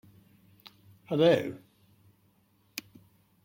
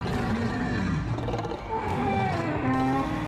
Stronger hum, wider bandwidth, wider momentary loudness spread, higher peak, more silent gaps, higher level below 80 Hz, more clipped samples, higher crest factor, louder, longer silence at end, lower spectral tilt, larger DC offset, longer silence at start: neither; first, 16.5 kHz vs 13.5 kHz; first, 19 LU vs 5 LU; about the same, -12 dBFS vs -14 dBFS; neither; second, -74 dBFS vs -42 dBFS; neither; first, 22 dB vs 12 dB; about the same, -28 LUFS vs -28 LUFS; first, 0.65 s vs 0 s; about the same, -6 dB/octave vs -7 dB/octave; neither; first, 1.1 s vs 0 s